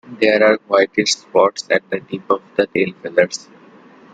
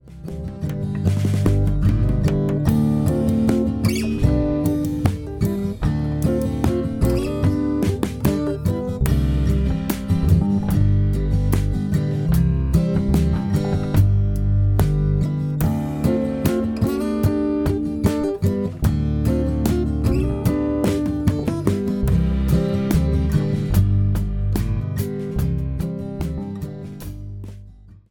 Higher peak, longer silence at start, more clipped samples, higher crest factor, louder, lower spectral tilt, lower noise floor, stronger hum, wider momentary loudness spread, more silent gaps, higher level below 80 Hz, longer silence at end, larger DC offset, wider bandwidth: about the same, -2 dBFS vs -2 dBFS; about the same, 0.1 s vs 0.05 s; neither; about the same, 16 dB vs 18 dB; first, -17 LUFS vs -21 LUFS; second, -3.5 dB/octave vs -8 dB/octave; about the same, -45 dBFS vs -43 dBFS; neither; about the same, 8 LU vs 6 LU; neither; second, -62 dBFS vs -26 dBFS; first, 0.75 s vs 0.15 s; neither; second, 9.2 kHz vs 18.5 kHz